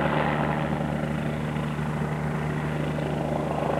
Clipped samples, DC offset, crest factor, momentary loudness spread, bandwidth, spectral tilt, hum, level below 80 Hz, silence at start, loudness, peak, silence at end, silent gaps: under 0.1%; under 0.1%; 14 dB; 4 LU; 12.5 kHz; -7.5 dB/octave; none; -44 dBFS; 0 s; -28 LUFS; -12 dBFS; 0 s; none